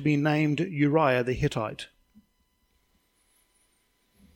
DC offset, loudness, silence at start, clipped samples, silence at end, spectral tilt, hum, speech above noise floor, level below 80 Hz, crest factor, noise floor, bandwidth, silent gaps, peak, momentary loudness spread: under 0.1%; -26 LUFS; 0 s; under 0.1%; 2.5 s; -7 dB/octave; none; 46 dB; -54 dBFS; 18 dB; -71 dBFS; 12 kHz; none; -10 dBFS; 13 LU